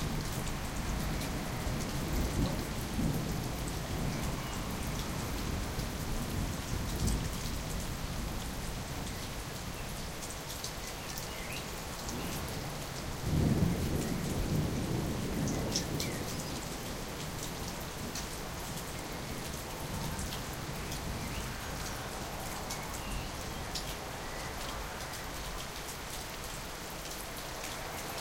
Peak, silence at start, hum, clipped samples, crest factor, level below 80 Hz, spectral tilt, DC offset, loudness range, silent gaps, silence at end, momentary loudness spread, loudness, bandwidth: -16 dBFS; 0 s; none; under 0.1%; 20 dB; -42 dBFS; -4.5 dB/octave; under 0.1%; 5 LU; none; 0 s; 6 LU; -37 LUFS; 17 kHz